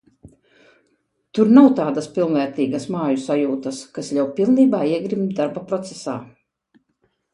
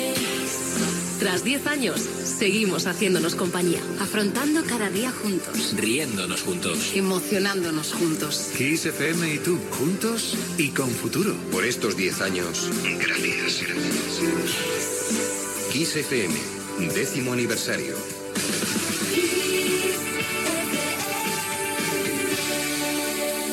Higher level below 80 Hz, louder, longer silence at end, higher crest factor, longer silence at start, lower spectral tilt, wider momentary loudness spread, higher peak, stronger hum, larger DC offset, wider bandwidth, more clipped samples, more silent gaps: about the same, -64 dBFS vs -60 dBFS; first, -19 LUFS vs -24 LUFS; first, 1.1 s vs 0 s; about the same, 20 dB vs 16 dB; first, 0.25 s vs 0 s; first, -7 dB/octave vs -3 dB/octave; first, 16 LU vs 3 LU; first, 0 dBFS vs -10 dBFS; neither; neither; second, 10.5 kHz vs 17 kHz; neither; neither